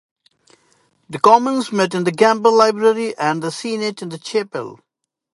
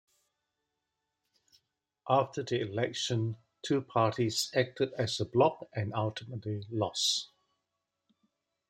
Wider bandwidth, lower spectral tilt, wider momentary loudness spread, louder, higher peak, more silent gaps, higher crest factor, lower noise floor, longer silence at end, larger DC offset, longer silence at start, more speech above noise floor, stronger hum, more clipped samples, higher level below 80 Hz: second, 11.5 kHz vs 16 kHz; about the same, -4.5 dB/octave vs -4.5 dB/octave; first, 15 LU vs 10 LU; first, -17 LUFS vs -32 LUFS; first, 0 dBFS vs -12 dBFS; neither; about the same, 18 dB vs 22 dB; second, -60 dBFS vs -85 dBFS; second, 0.6 s vs 1.45 s; neither; second, 1.1 s vs 2.05 s; second, 43 dB vs 54 dB; neither; neither; first, -68 dBFS vs -74 dBFS